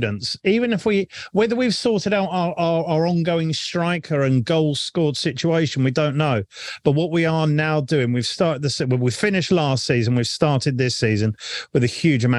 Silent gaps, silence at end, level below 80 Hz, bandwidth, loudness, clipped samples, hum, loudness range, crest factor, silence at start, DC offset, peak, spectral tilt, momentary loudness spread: none; 0 s; -56 dBFS; 11.5 kHz; -20 LUFS; under 0.1%; none; 1 LU; 18 dB; 0 s; under 0.1%; -2 dBFS; -6 dB/octave; 4 LU